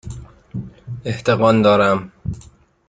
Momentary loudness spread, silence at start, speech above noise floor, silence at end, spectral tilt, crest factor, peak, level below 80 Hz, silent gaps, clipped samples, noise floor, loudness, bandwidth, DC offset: 21 LU; 0.05 s; 31 dB; 0.5 s; -7 dB/octave; 18 dB; 0 dBFS; -44 dBFS; none; under 0.1%; -46 dBFS; -16 LUFS; 9.2 kHz; under 0.1%